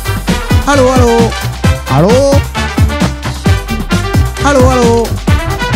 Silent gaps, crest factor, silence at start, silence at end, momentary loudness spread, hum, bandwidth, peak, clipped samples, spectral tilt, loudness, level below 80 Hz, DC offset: none; 10 dB; 0 s; 0 s; 7 LU; none; 16.5 kHz; 0 dBFS; 0.3%; -5.5 dB/octave; -10 LUFS; -18 dBFS; under 0.1%